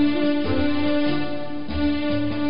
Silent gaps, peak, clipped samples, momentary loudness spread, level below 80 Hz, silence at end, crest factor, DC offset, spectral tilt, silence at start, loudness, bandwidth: none; -10 dBFS; under 0.1%; 7 LU; -40 dBFS; 0 s; 12 dB; 5%; -11 dB/octave; 0 s; -23 LUFS; 5.4 kHz